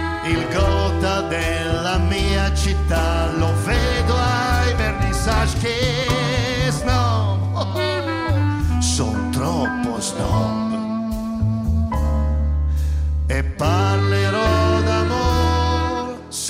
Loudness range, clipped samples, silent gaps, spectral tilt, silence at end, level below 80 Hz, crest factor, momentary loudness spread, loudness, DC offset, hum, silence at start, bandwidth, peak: 3 LU; under 0.1%; none; -5.5 dB/octave; 0 s; -26 dBFS; 12 dB; 4 LU; -20 LUFS; under 0.1%; none; 0 s; 15 kHz; -6 dBFS